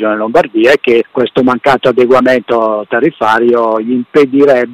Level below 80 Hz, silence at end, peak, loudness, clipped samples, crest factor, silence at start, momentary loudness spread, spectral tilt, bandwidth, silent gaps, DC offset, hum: -48 dBFS; 0 s; 0 dBFS; -10 LUFS; under 0.1%; 8 dB; 0 s; 5 LU; -6 dB/octave; 13 kHz; none; under 0.1%; none